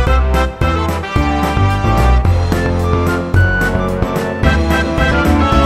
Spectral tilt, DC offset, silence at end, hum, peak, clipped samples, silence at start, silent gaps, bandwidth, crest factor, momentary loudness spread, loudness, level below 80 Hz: -6.5 dB/octave; under 0.1%; 0 s; none; 0 dBFS; under 0.1%; 0 s; none; 14.5 kHz; 12 dB; 4 LU; -14 LUFS; -18 dBFS